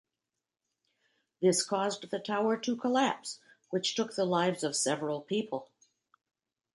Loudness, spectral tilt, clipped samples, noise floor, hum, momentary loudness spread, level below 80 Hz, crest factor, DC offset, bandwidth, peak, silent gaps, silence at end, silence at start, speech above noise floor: -31 LUFS; -3.5 dB/octave; under 0.1%; -89 dBFS; none; 10 LU; -82 dBFS; 18 dB; under 0.1%; 11.5 kHz; -14 dBFS; none; 1.1 s; 1.4 s; 58 dB